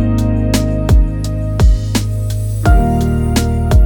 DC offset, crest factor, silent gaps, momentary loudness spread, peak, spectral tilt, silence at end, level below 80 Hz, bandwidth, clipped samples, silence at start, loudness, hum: under 0.1%; 12 dB; none; 6 LU; 0 dBFS; -6.5 dB/octave; 0 s; -16 dBFS; 19.5 kHz; under 0.1%; 0 s; -15 LUFS; none